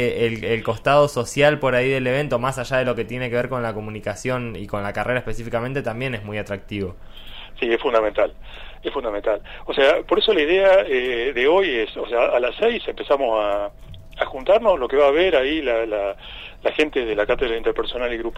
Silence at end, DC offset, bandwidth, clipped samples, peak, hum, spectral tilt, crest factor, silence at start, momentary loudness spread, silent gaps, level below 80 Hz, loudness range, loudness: 0 s; under 0.1%; 14 kHz; under 0.1%; -4 dBFS; none; -5.5 dB/octave; 18 dB; 0 s; 12 LU; none; -40 dBFS; 7 LU; -21 LUFS